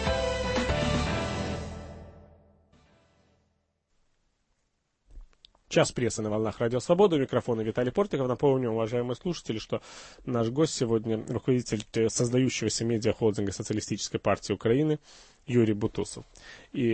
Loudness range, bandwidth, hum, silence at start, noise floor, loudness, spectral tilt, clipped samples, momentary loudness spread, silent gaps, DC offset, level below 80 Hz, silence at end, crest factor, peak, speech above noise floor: 7 LU; 8.8 kHz; none; 0 s; -76 dBFS; -28 LUFS; -5.5 dB/octave; under 0.1%; 11 LU; none; under 0.1%; -46 dBFS; 0 s; 20 dB; -8 dBFS; 48 dB